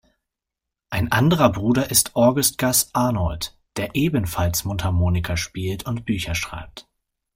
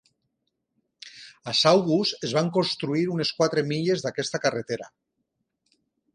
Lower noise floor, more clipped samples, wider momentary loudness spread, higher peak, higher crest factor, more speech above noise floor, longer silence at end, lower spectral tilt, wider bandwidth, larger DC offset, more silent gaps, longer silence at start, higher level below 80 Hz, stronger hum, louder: first, -85 dBFS vs -78 dBFS; neither; second, 12 LU vs 15 LU; first, -2 dBFS vs -6 dBFS; about the same, 20 dB vs 22 dB; first, 64 dB vs 54 dB; second, 0.55 s vs 1.3 s; about the same, -4.5 dB/octave vs -4.5 dB/octave; first, 16.5 kHz vs 10.5 kHz; neither; neither; second, 0.9 s vs 1.05 s; first, -42 dBFS vs -68 dBFS; neither; first, -21 LUFS vs -24 LUFS